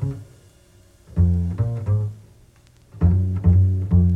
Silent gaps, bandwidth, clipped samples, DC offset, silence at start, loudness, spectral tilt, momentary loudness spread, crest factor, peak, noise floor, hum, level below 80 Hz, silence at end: none; 2.2 kHz; under 0.1%; under 0.1%; 0 s; -21 LUFS; -11 dB/octave; 12 LU; 14 dB; -6 dBFS; -52 dBFS; none; -32 dBFS; 0 s